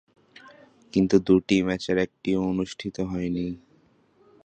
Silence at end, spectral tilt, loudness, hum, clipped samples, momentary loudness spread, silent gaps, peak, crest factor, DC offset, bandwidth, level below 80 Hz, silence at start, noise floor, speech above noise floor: 0.9 s; -6.5 dB/octave; -25 LUFS; none; under 0.1%; 11 LU; none; -6 dBFS; 20 dB; under 0.1%; 9 kHz; -52 dBFS; 0.45 s; -61 dBFS; 37 dB